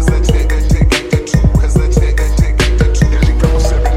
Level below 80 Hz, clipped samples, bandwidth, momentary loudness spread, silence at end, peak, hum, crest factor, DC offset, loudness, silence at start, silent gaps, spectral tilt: -12 dBFS; under 0.1%; 12.5 kHz; 2 LU; 0 s; 0 dBFS; none; 10 dB; under 0.1%; -13 LUFS; 0 s; none; -6 dB/octave